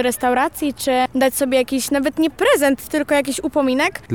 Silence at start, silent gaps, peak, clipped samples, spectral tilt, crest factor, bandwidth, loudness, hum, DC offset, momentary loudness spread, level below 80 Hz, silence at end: 0 s; none; -4 dBFS; under 0.1%; -3.5 dB/octave; 14 dB; 19.5 kHz; -18 LUFS; none; 0.3%; 4 LU; -50 dBFS; 0 s